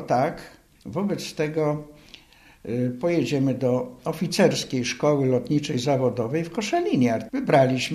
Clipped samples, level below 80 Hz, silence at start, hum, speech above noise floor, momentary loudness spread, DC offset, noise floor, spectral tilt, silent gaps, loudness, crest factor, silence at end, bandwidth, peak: under 0.1%; -58 dBFS; 0 s; none; 29 dB; 10 LU; under 0.1%; -52 dBFS; -6 dB/octave; none; -24 LUFS; 18 dB; 0 s; 14 kHz; -6 dBFS